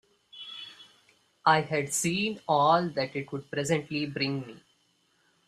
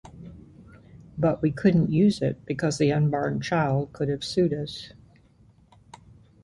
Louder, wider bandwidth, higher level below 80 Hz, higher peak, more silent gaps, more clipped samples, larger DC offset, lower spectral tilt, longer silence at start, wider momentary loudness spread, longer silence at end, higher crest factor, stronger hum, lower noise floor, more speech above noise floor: second, -28 LUFS vs -25 LUFS; first, 15.5 kHz vs 11.5 kHz; second, -68 dBFS vs -54 dBFS; about the same, -8 dBFS vs -8 dBFS; neither; neither; neither; second, -4 dB/octave vs -7 dB/octave; first, 0.35 s vs 0.05 s; about the same, 18 LU vs 20 LU; second, 0.9 s vs 1.55 s; about the same, 22 dB vs 18 dB; neither; first, -69 dBFS vs -57 dBFS; first, 42 dB vs 33 dB